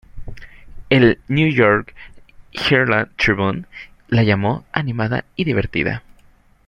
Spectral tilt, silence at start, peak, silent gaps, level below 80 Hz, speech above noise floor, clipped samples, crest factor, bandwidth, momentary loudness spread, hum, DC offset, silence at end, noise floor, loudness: -7 dB/octave; 0.15 s; -2 dBFS; none; -42 dBFS; 34 dB; under 0.1%; 18 dB; 9.8 kHz; 18 LU; none; under 0.1%; 0.7 s; -51 dBFS; -17 LUFS